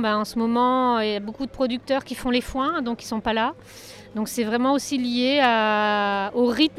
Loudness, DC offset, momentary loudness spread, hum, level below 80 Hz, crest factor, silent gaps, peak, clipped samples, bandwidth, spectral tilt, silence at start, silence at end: -23 LUFS; under 0.1%; 10 LU; none; -50 dBFS; 18 dB; none; -6 dBFS; under 0.1%; 15 kHz; -4 dB/octave; 0 s; 0 s